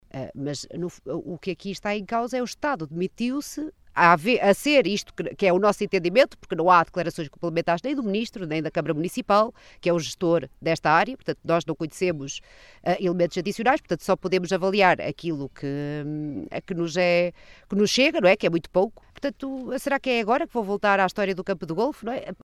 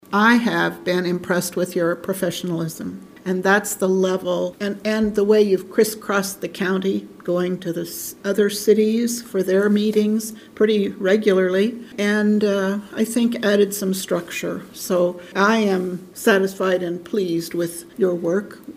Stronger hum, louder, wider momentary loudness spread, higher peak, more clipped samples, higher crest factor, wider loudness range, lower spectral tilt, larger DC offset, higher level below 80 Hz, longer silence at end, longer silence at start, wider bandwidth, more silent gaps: neither; second, -24 LUFS vs -20 LUFS; first, 12 LU vs 9 LU; about the same, -2 dBFS vs -2 dBFS; neither; about the same, 22 dB vs 18 dB; about the same, 4 LU vs 3 LU; about the same, -5 dB/octave vs -5 dB/octave; neither; about the same, -56 dBFS vs -60 dBFS; about the same, 0.1 s vs 0.05 s; about the same, 0.15 s vs 0.1 s; second, 13.5 kHz vs 16 kHz; neither